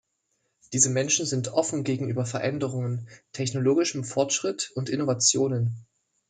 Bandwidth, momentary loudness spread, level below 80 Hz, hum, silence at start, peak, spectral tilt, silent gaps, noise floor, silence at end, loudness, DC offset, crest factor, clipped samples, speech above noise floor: 9.6 kHz; 10 LU; -68 dBFS; none; 0.7 s; -6 dBFS; -4 dB/octave; none; -75 dBFS; 0.45 s; -25 LUFS; under 0.1%; 20 dB; under 0.1%; 49 dB